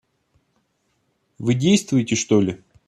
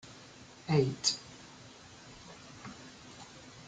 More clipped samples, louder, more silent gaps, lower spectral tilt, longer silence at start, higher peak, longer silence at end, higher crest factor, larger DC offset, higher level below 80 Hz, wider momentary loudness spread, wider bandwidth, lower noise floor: neither; first, -20 LUFS vs -31 LUFS; neither; about the same, -5 dB/octave vs -4.5 dB/octave; first, 1.4 s vs 0.05 s; first, -4 dBFS vs -14 dBFS; first, 0.3 s vs 0 s; second, 18 dB vs 24 dB; neither; first, -60 dBFS vs -68 dBFS; second, 8 LU vs 22 LU; first, 12.5 kHz vs 9.6 kHz; first, -69 dBFS vs -54 dBFS